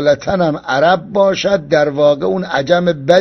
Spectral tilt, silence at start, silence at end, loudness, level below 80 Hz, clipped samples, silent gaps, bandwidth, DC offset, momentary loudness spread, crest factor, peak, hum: -5.5 dB/octave; 0 s; 0 s; -14 LUFS; -48 dBFS; under 0.1%; none; 6.4 kHz; under 0.1%; 4 LU; 14 dB; 0 dBFS; none